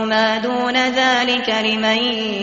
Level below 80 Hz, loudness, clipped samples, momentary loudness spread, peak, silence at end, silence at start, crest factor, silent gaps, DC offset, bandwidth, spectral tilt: -56 dBFS; -17 LUFS; under 0.1%; 3 LU; -4 dBFS; 0 s; 0 s; 14 dB; none; under 0.1%; 8 kHz; -0.5 dB/octave